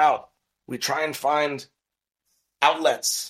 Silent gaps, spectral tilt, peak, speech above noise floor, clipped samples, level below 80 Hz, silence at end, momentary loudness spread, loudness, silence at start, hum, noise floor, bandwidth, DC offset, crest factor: none; -1.5 dB/octave; -2 dBFS; 63 dB; under 0.1%; -74 dBFS; 0 s; 10 LU; -23 LUFS; 0 s; none; -86 dBFS; 16 kHz; under 0.1%; 22 dB